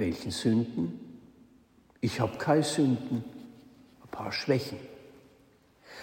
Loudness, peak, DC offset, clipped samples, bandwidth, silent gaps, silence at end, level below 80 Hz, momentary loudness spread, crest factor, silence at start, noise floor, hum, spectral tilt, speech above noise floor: -30 LUFS; -12 dBFS; under 0.1%; under 0.1%; 16 kHz; none; 0 s; -62 dBFS; 23 LU; 20 dB; 0 s; -62 dBFS; none; -5.5 dB/octave; 33 dB